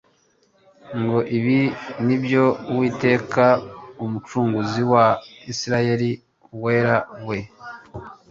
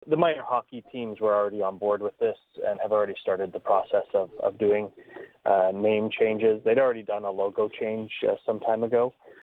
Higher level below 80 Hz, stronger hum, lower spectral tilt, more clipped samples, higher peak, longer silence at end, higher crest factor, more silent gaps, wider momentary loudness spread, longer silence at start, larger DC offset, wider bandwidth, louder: first, -56 dBFS vs -70 dBFS; neither; second, -6.5 dB/octave vs -8 dB/octave; neither; first, -2 dBFS vs -8 dBFS; second, 0.15 s vs 0.35 s; about the same, 18 dB vs 18 dB; neither; first, 18 LU vs 8 LU; first, 0.85 s vs 0.05 s; neither; first, 7.6 kHz vs 4.1 kHz; first, -21 LUFS vs -26 LUFS